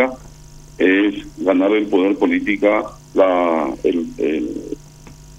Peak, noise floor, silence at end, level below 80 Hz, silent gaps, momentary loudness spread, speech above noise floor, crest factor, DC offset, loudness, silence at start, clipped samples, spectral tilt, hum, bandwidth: 0 dBFS; -40 dBFS; 0 s; -46 dBFS; none; 10 LU; 23 dB; 18 dB; under 0.1%; -18 LUFS; 0 s; under 0.1%; -6 dB/octave; none; 10 kHz